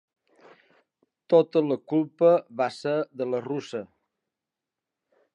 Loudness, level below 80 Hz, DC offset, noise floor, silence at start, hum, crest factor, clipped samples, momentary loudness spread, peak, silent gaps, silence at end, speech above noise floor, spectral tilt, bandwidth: -25 LUFS; -82 dBFS; under 0.1%; -88 dBFS; 1.3 s; none; 20 dB; under 0.1%; 11 LU; -8 dBFS; none; 1.5 s; 64 dB; -7 dB/octave; 9 kHz